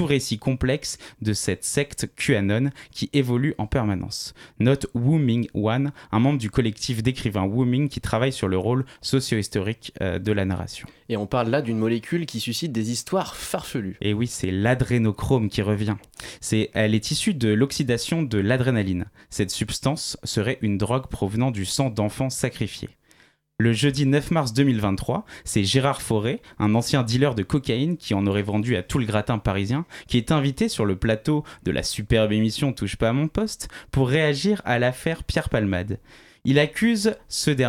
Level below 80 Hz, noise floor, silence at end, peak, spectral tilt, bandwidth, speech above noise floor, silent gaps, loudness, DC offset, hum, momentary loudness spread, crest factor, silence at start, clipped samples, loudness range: -44 dBFS; -58 dBFS; 0 s; -6 dBFS; -5.5 dB/octave; 16 kHz; 35 dB; none; -24 LUFS; under 0.1%; none; 8 LU; 18 dB; 0 s; under 0.1%; 3 LU